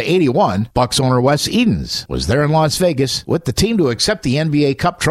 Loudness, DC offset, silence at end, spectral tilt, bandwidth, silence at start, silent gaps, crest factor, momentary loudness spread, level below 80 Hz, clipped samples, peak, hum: -16 LUFS; under 0.1%; 0 s; -5 dB/octave; 15.5 kHz; 0 s; none; 14 dB; 4 LU; -36 dBFS; under 0.1%; -2 dBFS; none